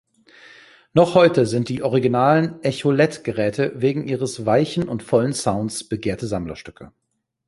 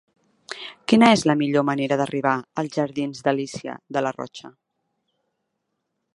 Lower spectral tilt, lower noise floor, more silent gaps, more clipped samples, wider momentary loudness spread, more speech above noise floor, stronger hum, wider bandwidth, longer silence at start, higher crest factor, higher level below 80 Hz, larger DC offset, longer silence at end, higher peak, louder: about the same, -6 dB/octave vs -5.5 dB/octave; second, -49 dBFS vs -77 dBFS; neither; neither; second, 10 LU vs 19 LU; second, 29 dB vs 56 dB; neither; about the same, 11.5 kHz vs 11.5 kHz; first, 0.95 s vs 0.5 s; about the same, 18 dB vs 22 dB; first, -52 dBFS vs -66 dBFS; neither; second, 0.6 s vs 1.65 s; about the same, -2 dBFS vs -2 dBFS; about the same, -20 LUFS vs -22 LUFS